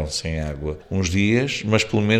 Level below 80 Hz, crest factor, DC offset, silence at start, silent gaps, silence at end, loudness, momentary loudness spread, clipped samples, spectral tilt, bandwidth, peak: -40 dBFS; 18 dB; under 0.1%; 0 s; none; 0 s; -22 LUFS; 8 LU; under 0.1%; -5 dB/octave; 13.5 kHz; -2 dBFS